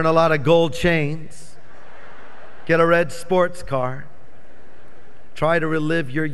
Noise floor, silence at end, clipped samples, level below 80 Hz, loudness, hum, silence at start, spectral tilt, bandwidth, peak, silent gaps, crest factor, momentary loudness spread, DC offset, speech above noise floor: -49 dBFS; 0 s; under 0.1%; -46 dBFS; -19 LUFS; none; 0 s; -6.5 dB/octave; 12 kHz; -2 dBFS; none; 18 dB; 13 LU; 5%; 30 dB